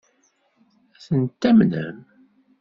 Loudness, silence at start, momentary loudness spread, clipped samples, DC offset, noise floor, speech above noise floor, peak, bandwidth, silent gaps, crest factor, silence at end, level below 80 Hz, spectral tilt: -20 LUFS; 1.1 s; 13 LU; under 0.1%; under 0.1%; -65 dBFS; 46 dB; -4 dBFS; 7 kHz; none; 18 dB; 0.65 s; -60 dBFS; -7.5 dB/octave